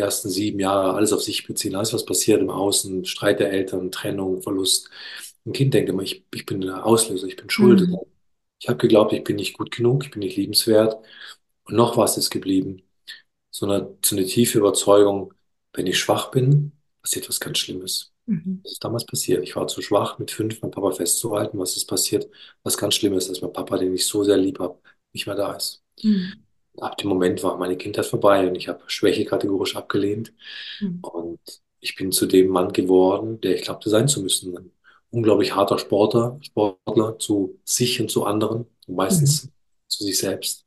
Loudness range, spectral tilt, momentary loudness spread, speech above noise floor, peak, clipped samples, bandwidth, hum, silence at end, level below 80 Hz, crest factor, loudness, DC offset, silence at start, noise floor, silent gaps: 4 LU; -4.5 dB/octave; 14 LU; 48 dB; -2 dBFS; under 0.1%; 13 kHz; none; 0.1 s; -64 dBFS; 20 dB; -21 LUFS; under 0.1%; 0 s; -70 dBFS; none